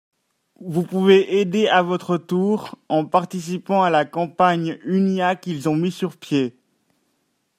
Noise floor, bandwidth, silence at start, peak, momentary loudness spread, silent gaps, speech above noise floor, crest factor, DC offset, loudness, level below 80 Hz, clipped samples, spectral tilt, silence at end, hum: -69 dBFS; 14.5 kHz; 0.6 s; -2 dBFS; 10 LU; none; 50 dB; 18 dB; under 0.1%; -20 LUFS; -68 dBFS; under 0.1%; -6.5 dB/octave; 1.1 s; none